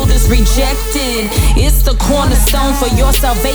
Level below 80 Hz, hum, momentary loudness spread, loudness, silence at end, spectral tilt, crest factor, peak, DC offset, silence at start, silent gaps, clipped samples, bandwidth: -12 dBFS; none; 3 LU; -12 LUFS; 0 s; -4.5 dB/octave; 10 dB; 0 dBFS; under 0.1%; 0 s; none; under 0.1%; over 20 kHz